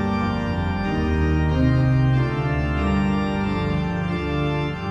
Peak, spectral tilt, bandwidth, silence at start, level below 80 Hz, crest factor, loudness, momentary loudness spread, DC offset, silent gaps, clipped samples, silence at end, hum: -8 dBFS; -8.5 dB/octave; 8 kHz; 0 s; -30 dBFS; 14 dB; -22 LUFS; 5 LU; under 0.1%; none; under 0.1%; 0 s; none